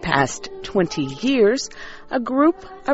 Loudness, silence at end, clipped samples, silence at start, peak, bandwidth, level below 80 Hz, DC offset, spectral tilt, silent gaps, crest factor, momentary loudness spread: -21 LUFS; 0 s; under 0.1%; 0 s; -2 dBFS; 8 kHz; -46 dBFS; under 0.1%; -4 dB/octave; none; 18 dB; 13 LU